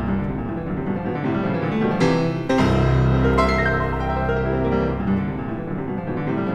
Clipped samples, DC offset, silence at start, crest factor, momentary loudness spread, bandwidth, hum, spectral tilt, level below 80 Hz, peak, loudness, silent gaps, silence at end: under 0.1%; under 0.1%; 0 s; 16 dB; 9 LU; 9.4 kHz; none; -7.5 dB/octave; -32 dBFS; -4 dBFS; -21 LUFS; none; 0 s